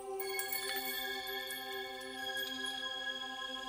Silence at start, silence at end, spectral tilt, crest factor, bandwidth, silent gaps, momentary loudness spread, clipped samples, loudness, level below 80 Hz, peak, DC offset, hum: 0 s; 0 s; 0 dB/octave; 20 dB; 16 kHz; none; 5 LU; under 0.1%; -38 LUFS; -74 dBFS; -22 dBFS; under 0.1%; none